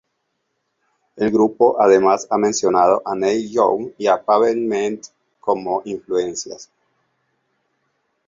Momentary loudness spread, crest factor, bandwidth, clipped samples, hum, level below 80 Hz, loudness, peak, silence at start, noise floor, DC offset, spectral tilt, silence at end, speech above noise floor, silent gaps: 11 LU; 18 dB; 7.8 kHz; under 0.1%; none; -60 dBFS; -18 LUFS; -2 dBFS; 1.15 s; -72 dBFS; under 0.1%; -4.5 dB/octave; 1.65 s; 55 dB; none